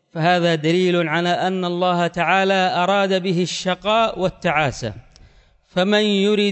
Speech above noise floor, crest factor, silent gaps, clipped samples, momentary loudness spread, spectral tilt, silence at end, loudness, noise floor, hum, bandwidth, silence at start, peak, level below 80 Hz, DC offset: 33 dB; 16 dB; none; under 0.1%; 5 LU; -5 dB/octave; 0 s; -19 LUFS; -51 dBFS; none; 8.4 kHz; 0.15 s; -4 dBFS; -52 dBFS; under 0.1%